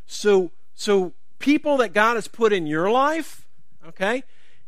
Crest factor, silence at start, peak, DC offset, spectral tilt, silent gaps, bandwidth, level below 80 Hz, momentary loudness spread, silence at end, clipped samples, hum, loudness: 20 dB; 0.1 s; -2 dBFS; 2%; -4.5 dB/octave; none; 15 kHz; -68 dBFS; 10 LU; 0.45 s; under 0.1%; none; -21 LUFS